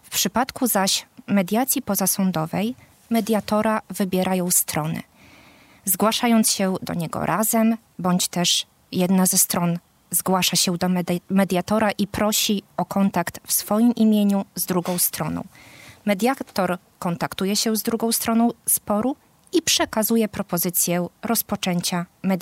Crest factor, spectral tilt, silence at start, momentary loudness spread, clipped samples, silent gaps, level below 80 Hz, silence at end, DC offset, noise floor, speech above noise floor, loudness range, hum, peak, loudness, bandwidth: 18 dB; -4 dB/octave; 0.1 s; 8 LU; under 0.1%; none; -58 dBFS; 0 s; under 0.1%; -51 dBFS; 29 dB; 3 LU; none; -4 dBFS; -21 LUFS; 16 kHz